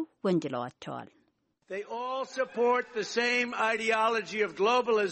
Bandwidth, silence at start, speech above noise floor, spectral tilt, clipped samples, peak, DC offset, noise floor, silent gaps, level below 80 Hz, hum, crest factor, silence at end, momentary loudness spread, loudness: 8.4 kHz; 0 s; 43 dB; -4 dB/octave; under 0.1%; -14 dBFS; under 0.1%; -72 dBFS; none; -76 dBFS; none; 16 dB; 0 s; 13 LU; -29 LUFS